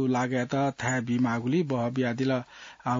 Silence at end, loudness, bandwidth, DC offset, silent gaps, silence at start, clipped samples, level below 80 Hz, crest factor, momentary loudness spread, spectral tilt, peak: 0 s; -28 LUFS; 7.6 kHz; under 0.1%; none; 0 s; under 0.1%; -66 dBFS; 14 dB; 4 LU; -6 dB/octave; -14 dBFS